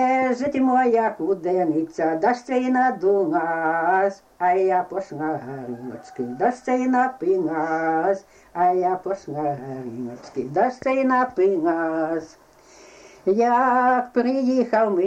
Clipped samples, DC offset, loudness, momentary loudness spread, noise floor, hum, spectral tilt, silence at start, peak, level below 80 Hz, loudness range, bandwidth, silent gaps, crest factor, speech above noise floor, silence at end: under 0.1%; under 0.1%; -22 LUFS; 12 LU; -49 dBFS; none; -7 dB/octave; 0 s; -8 dBFS; -64 dBFS; 3 LU; 8.6 kHz; none; 14 dB; 28 dB; 0 s